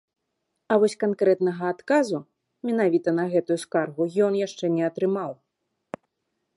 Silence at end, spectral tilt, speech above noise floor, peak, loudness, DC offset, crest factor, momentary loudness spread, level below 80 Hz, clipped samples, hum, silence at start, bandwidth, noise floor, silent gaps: 1.25 s; -6.5 dB/octave; 55 dB; -6 dBFS; -24 LUFS; under 0.1%; 18 dB; 12 LU; -76 dBFS; under 0.1%; none; 0.7 s; 11.5 kHz; -79 dBFS; none